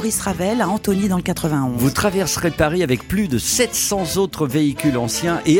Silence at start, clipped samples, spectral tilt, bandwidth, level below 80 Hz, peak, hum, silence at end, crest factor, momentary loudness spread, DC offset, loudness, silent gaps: 0 s; under 0.1%; -4.5 dB/octave; 17 kHz; -40 dBFS; -4 dBFS; none; 0 s; 16 dB; 3 LU; under 0.1%; -19 LUFS; none